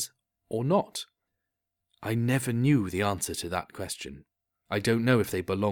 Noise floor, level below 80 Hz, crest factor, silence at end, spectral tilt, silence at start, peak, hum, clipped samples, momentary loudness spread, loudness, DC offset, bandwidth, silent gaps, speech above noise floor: -85 dBFS; -58 dBFS; 20 dB; 0 s; -5.5 dB/octave; 0 s; -10 dBFS; none; under 0.1%; 13 LU; -28 LUFS; under 0.1%; 19.5 kHz; none; 57 dB